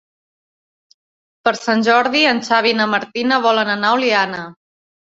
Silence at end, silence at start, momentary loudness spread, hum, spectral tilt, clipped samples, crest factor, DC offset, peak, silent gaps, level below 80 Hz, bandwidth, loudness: 0.6 s; 1.45 s; 7 LU; none; -3.5 dB/octave; under 0.1%; 16 dB; under 0.1%; 0 dBFS; none; -64 dBFS; 7.8 kHz; -15 LUFS